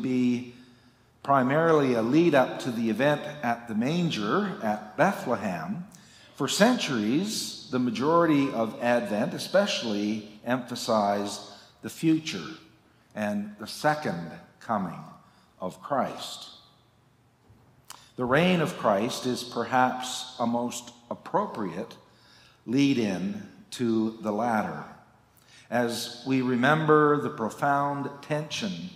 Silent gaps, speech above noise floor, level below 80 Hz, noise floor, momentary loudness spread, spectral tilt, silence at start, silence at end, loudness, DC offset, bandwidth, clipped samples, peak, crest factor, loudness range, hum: none; 36 dB; -70 dBFS; -62 dBFS; 16 LU; -5 dB/octave; 0 s; 0 s; -27 LUFS; under 0.1%; 16 kHz; under 0.1%; -4 dBFS; 24 dB; 7 LU; none